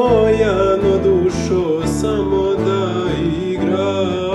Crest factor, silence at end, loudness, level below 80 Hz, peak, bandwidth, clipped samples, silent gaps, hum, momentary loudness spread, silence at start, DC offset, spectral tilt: 14 dB; 0 s; -16 LUFS; -34 dBFS; -2 dBFS; 12 kHz; under 0.1%; none; none; 5 LU; 0 s; under 0.1%; -6.5 dB/octave